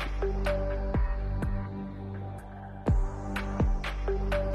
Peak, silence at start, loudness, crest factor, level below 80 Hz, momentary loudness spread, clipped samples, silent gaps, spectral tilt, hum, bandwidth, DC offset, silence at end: -16 dBFS; 0 s; -33 LUFS; 14 dB; -32 dBFS; 9 LU; under 0.1%; none; -7.5 dB/octave; 50 Hz at -45 dBFS; 11 kHz; under 0.1%; 0 s